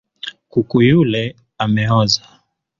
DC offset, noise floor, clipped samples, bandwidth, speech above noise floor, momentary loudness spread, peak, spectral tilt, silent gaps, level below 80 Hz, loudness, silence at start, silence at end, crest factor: under 0.1%; -35 dBFS; under 0.1%; 7.4 kHz; 20 dB; 14 LU; -2 dBFS; -5.5 dB/octave; none; -46 dBFS; -16 LUFS; 0.25 s; 0.6 s; 14 dB